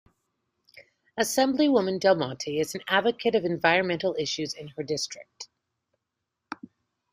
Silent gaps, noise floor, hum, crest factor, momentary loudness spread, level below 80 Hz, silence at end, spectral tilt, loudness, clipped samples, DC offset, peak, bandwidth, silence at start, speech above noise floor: none; -84 dBFS; none; 22 dB; 19 LU; -70 dBFS; 0.6 s; -4 dB/octave; -26 LUFS; under 0.1%; under 0.1%; -6 dBFS; 15.5 kHz; 0.75 s; 58 dB